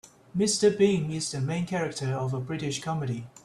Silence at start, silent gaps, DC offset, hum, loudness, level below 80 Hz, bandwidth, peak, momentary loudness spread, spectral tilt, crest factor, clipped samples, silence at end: 0.05 s; none; under 0.1%; none; -28 LUFS; -62 dBFS; 13 kHz; -10 dBFS; 9 LU; -5 dB/octave; 18 dB; under 0.1%; 0.05 s